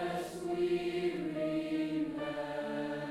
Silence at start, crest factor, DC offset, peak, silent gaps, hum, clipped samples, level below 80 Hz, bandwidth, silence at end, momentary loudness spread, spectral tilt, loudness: 0 s; 12 dB; under 0.1%; -24 dBFS; none; none; under 0.1%; -68 dBFS; 14 kHz; 0 s; 5 LU; -6 dB/octave; -36 LUFS